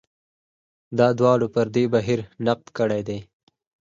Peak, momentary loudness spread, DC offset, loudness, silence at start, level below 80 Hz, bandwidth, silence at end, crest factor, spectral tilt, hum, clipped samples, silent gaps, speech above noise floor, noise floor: -4 dBFS; 10 LU; under 0.1%; -22 LUFS; 0.9 s; -58 dBFS; 7.6 kHz; 0.7 s; 18 dB; -7 dB/octave; none; under 0.1%; none; over 69 dB; under -90 dBFS